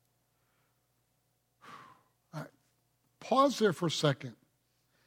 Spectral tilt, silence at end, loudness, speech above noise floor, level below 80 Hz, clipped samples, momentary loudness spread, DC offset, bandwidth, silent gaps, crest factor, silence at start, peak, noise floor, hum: -5 dB/octave; 0.75 s; -30 LUFS; 48 dB; -82 dBFS; under 0.1%; 23 LU; under 0.1%; 16.5 kHz; none; 22 dB; 1.65 s; -14 dBFS; -77 dBFS; none